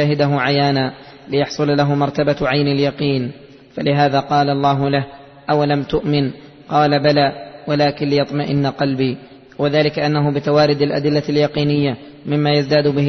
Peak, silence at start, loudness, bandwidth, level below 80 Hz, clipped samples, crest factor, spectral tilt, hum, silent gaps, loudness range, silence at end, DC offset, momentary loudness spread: -2 dBFS; 0 s; -17 LUFS; 6.4 kHz; -48 dBFS; under 0.1%; 14 dB; -7 dB/octave; none; none; 1 LU; 0 s; under 0.1%; 8 LU